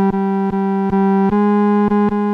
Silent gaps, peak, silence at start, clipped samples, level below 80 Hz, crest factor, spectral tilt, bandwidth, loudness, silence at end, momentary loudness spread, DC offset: none; -6 dBFS; 0 s; under 0.1%; -44 dBFS; 8 dB; -10 dB/octave; 4.3 kHz; -15 LUFS; 0 s; 4 LU; under 0.1%